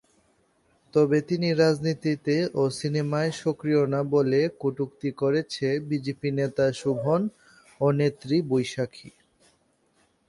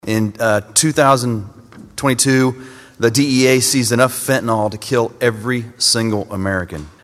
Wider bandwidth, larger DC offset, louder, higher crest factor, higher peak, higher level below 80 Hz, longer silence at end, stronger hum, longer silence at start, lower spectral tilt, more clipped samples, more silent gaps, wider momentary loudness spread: second, 11.5 kHz vs 15 kHz; neither; second, -25 LUFS vs -16 LUFS; about the same, 18 dB vs 16 dB; second, -8 dBFS vs 0 dBFS; second, -64 dBFS vs -50 dBFS; first, 1.2 s vs 0.15 s; neither; first, 0.95 s vs 0.05 s; first, -6.5 dB/octave vs -4 dB/octave; neither; neither; about the same, 7 LU vs 9 LU